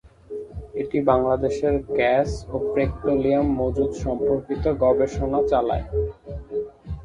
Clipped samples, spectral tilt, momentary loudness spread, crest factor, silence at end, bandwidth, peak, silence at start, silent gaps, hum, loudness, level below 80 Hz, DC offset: under 0.1%; -7.5 dB/octave; 12 LU; 18 dB; 0 s; 10 kHz; -4 dBFS; 0.3 s; none; none; -23 LUFS; -36 dBFS; under 0.1%